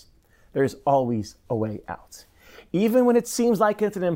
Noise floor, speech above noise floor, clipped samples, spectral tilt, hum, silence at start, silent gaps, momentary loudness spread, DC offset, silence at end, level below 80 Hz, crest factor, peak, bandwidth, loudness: -57 dBFS; 34 dB; under 0.1%; -6 dB/octave; none; 0.55 s; none; 13 LU; under 0.1%; 0 s; -58 dBFS; 18 dB; -6 dBFS; 16 kHz; -23 LUFS